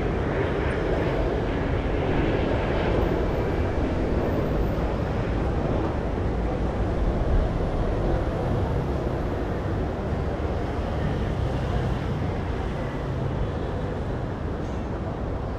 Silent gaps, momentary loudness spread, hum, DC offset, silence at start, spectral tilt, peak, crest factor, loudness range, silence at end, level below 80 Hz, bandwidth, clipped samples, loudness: none; 5 LU; none; under 0.1%; 0 s; -8 dB/octave; -10 dBFS; 14 dB; 3 LU; 0 s; -30 dBFS; 9.4 kHz; under 0.1%; -27 LUFS